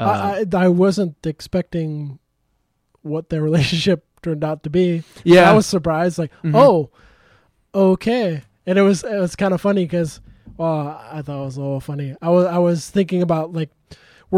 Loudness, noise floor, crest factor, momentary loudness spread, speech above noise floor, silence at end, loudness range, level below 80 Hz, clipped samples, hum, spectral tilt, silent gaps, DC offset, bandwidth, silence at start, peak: -18 LUFS; -67 dBFS; 16 dB; 15 LU; 50 dB; 0 s; 7 LU; -50 dBFS; under 0.1%; none; -6.5 dB/octave; none; under 0.1%; 14 kHz; 0 s; -2 dBFS